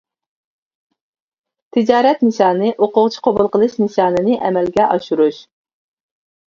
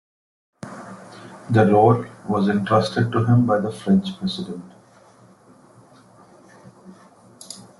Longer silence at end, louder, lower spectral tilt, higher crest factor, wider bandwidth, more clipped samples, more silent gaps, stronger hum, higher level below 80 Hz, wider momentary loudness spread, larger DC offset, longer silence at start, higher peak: first, 1.05 s vs 0.25 s; first, -15 LUFS vs -19 LUFS; about the same, -6.5 dB/octave vs -7.5 dB/octave; about the same, 16 dB vs 20 dB; second, 7.4 kHz vs 12 kHz; neither; neither; neither; about the same, -56 dBFS vs -58 dBFS; second, 4 LU vs 23 LU; neither; first, 1.75 s vs 0.65 s; first, 0 dBFS vs -4 dBFS